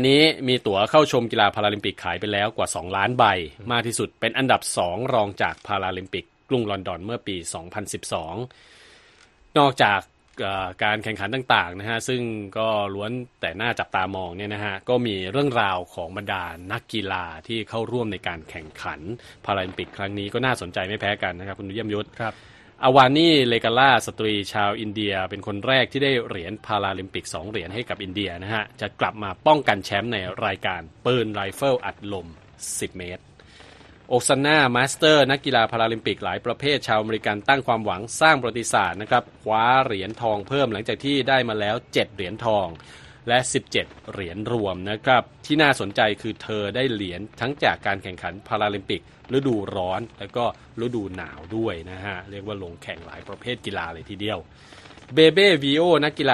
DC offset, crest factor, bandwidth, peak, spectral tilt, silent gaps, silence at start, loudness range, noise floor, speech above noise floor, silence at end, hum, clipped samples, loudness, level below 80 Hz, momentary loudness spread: under 0.1%; 22 dB; 12.5 kHz; 0 dBFS; -4 dB/octave; none; 0 s; 9 LU; -54 dBFS; 31 dB; 0 s; none; under 0.1%; -23 LUFS; -54 dBFS; 14 LU